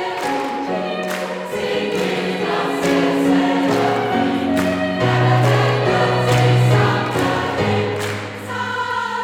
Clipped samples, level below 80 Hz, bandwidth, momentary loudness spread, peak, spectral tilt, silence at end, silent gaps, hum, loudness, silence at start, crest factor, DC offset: under 0.1%; -50 dBFS; 15.5 kHz; 8 LU; -2 dBFS; -6 dB/octave; 0 s; none; none; -18 LUFS; 0 s; 14 dB; under 0.1%